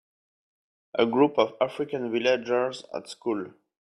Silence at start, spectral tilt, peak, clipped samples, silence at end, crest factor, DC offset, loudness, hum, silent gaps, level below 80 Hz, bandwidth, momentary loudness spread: 0.95 s; -5.5 dB/octave; -8 dBFS; under 0.1%; 0.35 s; 20 dB; under 0.1%; -26 LUFS; none; none; -72 dBFS; 11.5 kHz; 12 LU